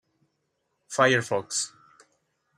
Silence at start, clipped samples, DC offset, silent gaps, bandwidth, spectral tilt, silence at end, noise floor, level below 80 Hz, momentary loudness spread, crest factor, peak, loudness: 0.9 s; under 0.1%; under 0.1%; none; 15.5 kHz; -3 dB/octave; 0.9 s; -77 dBFS; -74 dBFS; 12 LU; 24 dB; -6 dBFS; -25 LUFS